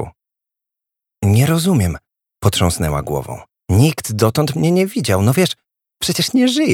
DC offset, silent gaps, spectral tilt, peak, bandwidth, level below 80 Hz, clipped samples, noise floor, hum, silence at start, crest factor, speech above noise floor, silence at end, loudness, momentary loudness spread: under 0.1%; none; -5.5 dB/octave; 0 dBFS; 18 kHz; -38 dBFS; under 0.1%; -84 dBFS; none; 0 s; 16 dB; 69 dB; 0 s; -16 LUFS; 10 LU